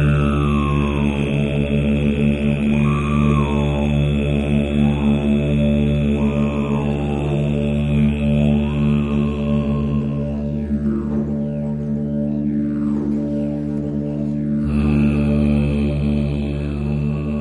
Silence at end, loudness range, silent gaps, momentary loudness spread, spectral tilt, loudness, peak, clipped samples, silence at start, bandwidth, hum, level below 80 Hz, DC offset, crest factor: 0 s; 4 LU; none; 6 LU; -8.5 dB/octave; -19 LUFS; -4 dBFS; under 0.1%; 0 s; 10.5 kHz; none; -28 dBFS; under 0.1%; 14 dB